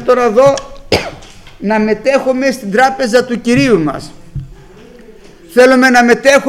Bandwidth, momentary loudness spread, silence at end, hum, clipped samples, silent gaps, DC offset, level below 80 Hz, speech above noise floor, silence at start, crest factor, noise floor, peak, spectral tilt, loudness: 16 kHz; 19 LU; 0 s; none; 0.2%; none; under 0.1%; -38 dBFS; 27 dB; 0 s; 12 dB; -37 dBFS; 0 dBFS; -4.5 dB/octave; -11 LUFS